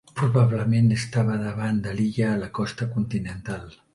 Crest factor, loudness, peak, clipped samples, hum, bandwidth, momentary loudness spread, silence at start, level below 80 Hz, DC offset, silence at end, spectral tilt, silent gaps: 16 dB; -24 LUFS; -6 dBFS; under 0.1%; none; 11.5 kHz; 11 LU; 0.15 s; -50 dBFS; under 0.1%; 0.25 s; -7.5 dB/octave; none